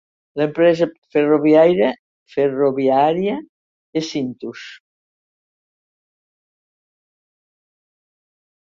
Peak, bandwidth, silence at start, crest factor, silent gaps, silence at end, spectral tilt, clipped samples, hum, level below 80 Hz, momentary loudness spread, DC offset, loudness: -2 dBFS; 7.4 kHz; 0.35 s; 18 dB; 0.98-1.02 s, 1.99-2.26 s, 3.49-3.93 s; 3.95 s; -6.5 dB/octave; under 0.1%; none; -64 dBFS; 19 LU; under 0.1%; -17 LUFS